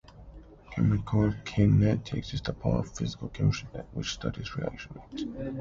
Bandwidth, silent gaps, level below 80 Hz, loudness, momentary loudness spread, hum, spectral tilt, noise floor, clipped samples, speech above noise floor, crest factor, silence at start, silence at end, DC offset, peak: 7.6 kHz; none; -44 dBFS; -30 LUFS; 13 LU; none; -7 dB/octave; -49 dBFS; under 0.1%; 20 dB; 16 dB; 0.1 s; 0 s; under 0.1%; -12 dBFS